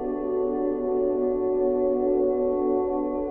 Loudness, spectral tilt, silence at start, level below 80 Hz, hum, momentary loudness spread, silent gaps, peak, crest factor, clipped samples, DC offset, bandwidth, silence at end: -25 LUFS; -12 dB/octave; 0 s; -48 dBFS; none; 3 LU; none; -14 dBFS; 10 dB; under 0.1%; under 0.1%; 2.6 kHz; 0 s